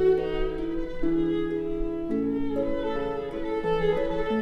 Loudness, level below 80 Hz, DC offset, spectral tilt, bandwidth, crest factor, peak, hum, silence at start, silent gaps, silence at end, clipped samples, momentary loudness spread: -28 LUFS; -38 dBFS; under 0.1%; -8 dB/octave; 6.4 kHz; 14 dB; -12 dBFS; none; 0 s; none; 0 s; under 0.1%; 6 LU